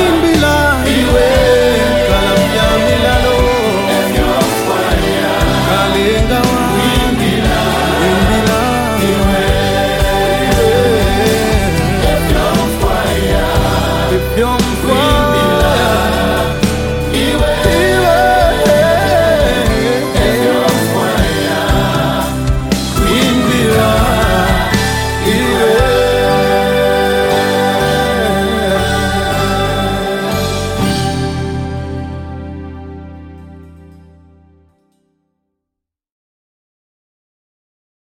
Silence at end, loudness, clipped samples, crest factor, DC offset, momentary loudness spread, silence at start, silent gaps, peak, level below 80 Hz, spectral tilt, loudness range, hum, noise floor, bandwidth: 4.25 s; -12 LUFS; under 0.1%; 12 dB; under 0.1%; 5 LU; 0 s; none; 0 dBFS; -22 dBFS; -5 dB/octave; 5 LU; none; -80 dBFS; 17 kHz